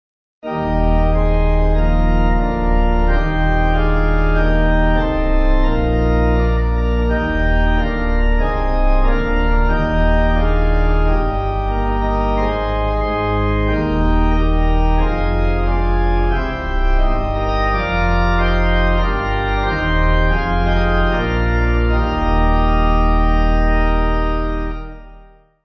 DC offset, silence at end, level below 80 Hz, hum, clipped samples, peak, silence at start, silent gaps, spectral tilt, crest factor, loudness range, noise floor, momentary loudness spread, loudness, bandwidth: under 0.1%; 0.45 s; -16 dBFS; none; under 0.1%; -4 dBFS; 0.45 s; none; -8.5 dB/octave; 12 dB; 2 LU; -44 dBFS; 3 LU; -18 LUFS; 6 kHz